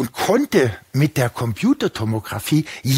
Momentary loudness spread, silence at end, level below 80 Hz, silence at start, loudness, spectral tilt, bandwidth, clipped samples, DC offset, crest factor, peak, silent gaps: 6 LU; 0 s; -54 dBFS; 0 s; -20 LUFS; -6 dB/octave; 16 kHz; under 0.1%; under 0.1%; 16 dB; -4 dBFS; none